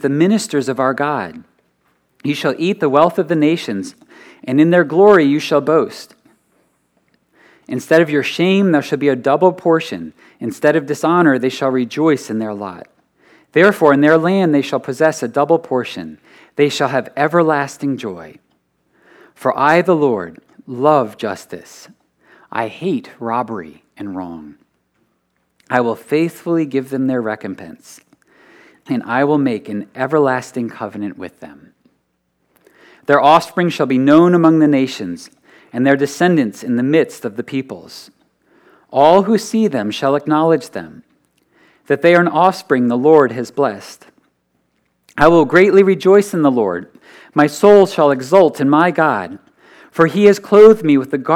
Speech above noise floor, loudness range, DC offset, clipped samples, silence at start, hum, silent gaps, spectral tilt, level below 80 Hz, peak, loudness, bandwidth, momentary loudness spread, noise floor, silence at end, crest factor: 52 dB; 8 LU; under 0.1%; under 0.1%; 0.05 s; none; none; -6 dB/octave; -54 dBFS; 0 dBFS; -14 LUFS; 15.5 kHz; 17 LU; -66 dBFS; 0 s; 16 dB